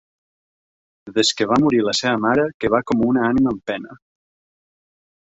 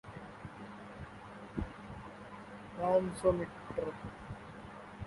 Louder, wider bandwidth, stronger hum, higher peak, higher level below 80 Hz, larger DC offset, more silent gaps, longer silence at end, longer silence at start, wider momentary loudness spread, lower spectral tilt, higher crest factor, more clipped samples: first, -18 LUFS vs -38 LUFS; second, 8 kHz vs 11.5 kHz; neither; first, -2 dBFS vs -18 dBFS; about the same, -52 dBFS vs -56 dBFS; neither; first, 2.54-2.60 s vs none; first, 1.25 s vs 0 s; first, 1.05 s vs 0.05 s; second, 9 LU vs 18 LU; second, -4.5 dB/octave vs -7 dB/octave; about the same, 18 dB vs 22 dB; neither